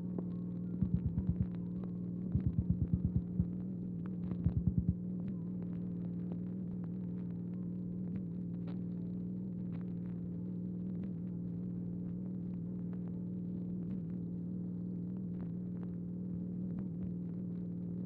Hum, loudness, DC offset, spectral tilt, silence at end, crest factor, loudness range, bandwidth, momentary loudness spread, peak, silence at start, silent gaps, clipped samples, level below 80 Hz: 60 Hz at -55 dBFS; -40 LUFS; under 0.1%; -13 dB/octave; 0 s; 18 dB; 4 LU; 2.5 kHz; 6 LU; -20 dBFS; 0 s; none; under 0.1%; -52 dBFS